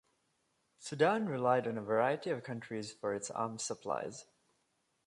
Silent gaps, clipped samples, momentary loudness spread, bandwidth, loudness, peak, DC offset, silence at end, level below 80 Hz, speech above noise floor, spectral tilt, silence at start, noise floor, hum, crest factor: none; under 0.1%; 13 LU; 11.5 kHz; -35 LUFS; -16 dBFS; under 0.1%; 0.85 s; -78 dBFS; 44 dB; -4.5 dB/octave; 0.8 s; -79 dBFS; none; 22 dB